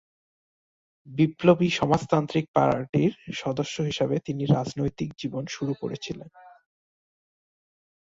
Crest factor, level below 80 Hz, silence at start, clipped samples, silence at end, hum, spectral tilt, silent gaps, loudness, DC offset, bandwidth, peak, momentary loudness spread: 22 dB; -58 dBFS; 1.05 s; under 0.1%; 1.6 s; none; -6.5 dB/octave; 2.48-2.54 s, 2.89-2.93 s; -26 LUFS; under 0.1%; 7.8 kHz; -6 dBFS; 11 LU